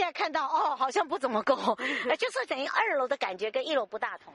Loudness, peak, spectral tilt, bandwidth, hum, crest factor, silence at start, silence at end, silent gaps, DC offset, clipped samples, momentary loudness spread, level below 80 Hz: -29 LUFS; -12 dBFS; -3 dB/octave; 11.5 kHz; none; 18 dB; 0 s; 0.05 s; none; under 0.1%; under 0.1%; 4 LU; -78 dBFS